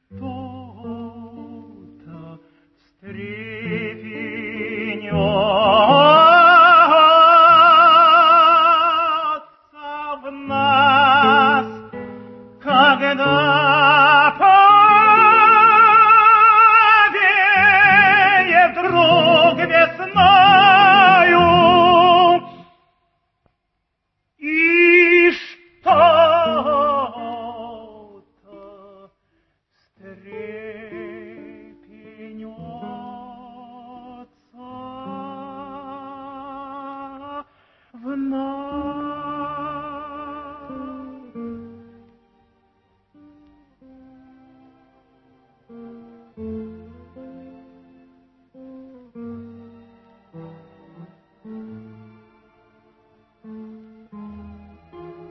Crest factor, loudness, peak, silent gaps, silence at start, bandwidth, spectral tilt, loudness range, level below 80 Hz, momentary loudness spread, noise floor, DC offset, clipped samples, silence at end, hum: 16 dB; -12 LUFS; 0 dBFS; none; 0.15 s; 6 kHz; -6.5 dB/octave; 22 LU; -54 dBFS; 25 LU; -74 dBFS; under 0.1%; under 0.1%; 0.2 s; none